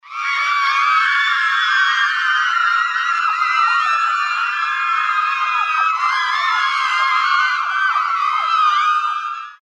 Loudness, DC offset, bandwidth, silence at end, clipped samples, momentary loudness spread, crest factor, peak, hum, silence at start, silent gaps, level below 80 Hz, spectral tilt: -16 LUFS; under 0.1%; 11 kHz; 0.2 s; under 0.1%; 4 LU; 12 dB; -4 dBFS; none; 0.05 s; none; -74 dBFS; 4 dB/octave